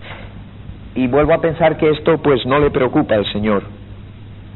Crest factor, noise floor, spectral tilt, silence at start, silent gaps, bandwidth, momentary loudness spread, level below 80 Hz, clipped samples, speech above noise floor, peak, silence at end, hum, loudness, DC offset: 16 dB; -35 dBFS; -5 dB/octave; 0 s; none; 4.2 kHz; 22 LU; -36 dBFS; under 0.1%; 20 dB; 0 dBFS; 0 s; none; -15 LUFS; 0.4%